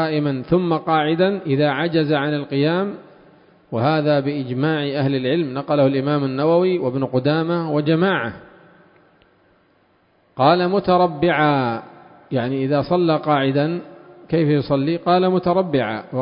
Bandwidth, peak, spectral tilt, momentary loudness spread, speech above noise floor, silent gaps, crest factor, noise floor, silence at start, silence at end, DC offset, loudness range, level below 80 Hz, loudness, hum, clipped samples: 5.4 kHz; 0 dBFS; -12 dB/octave; 7 LU; 41 dB; none; 18 dB; -59 dBFS; 0 s; 0 s; under 0.1%; 3 LU; -56 dBFS; -19 LUFS; none; under 0.1%